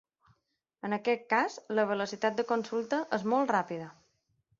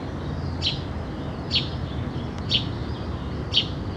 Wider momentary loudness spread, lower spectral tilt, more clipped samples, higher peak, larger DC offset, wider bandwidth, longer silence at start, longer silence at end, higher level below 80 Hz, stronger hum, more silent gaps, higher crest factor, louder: about the same, 10 LU vs 9 LU; about the same, -5 dB/octave vs -5.5 dB/octave; neither; second, -12 dBFS vs -6 dBFS; neither; second, 7.6 kHz vs 9.6 kHz; first, 0.85 s vs 0 s; first, 0.7 s vs 0 s; second, -78 dBFS vs -38 dBFS; neither; neither; about the same, 20 dB vs 22 dB; second, -31 LUFS vs -27 LUFS